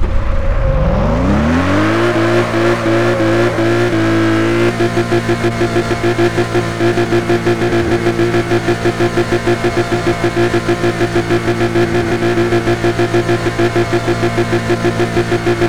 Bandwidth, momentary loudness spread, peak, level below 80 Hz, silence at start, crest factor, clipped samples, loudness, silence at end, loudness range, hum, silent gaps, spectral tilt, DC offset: 13.5 kHz; 3 LU; -2 dBFS; -24 dBFS; 0 s; 12 dB; under 0.1%; -14 LUFS; 0 s; 1 LU; none; none; -6.5 dB/octave; 2%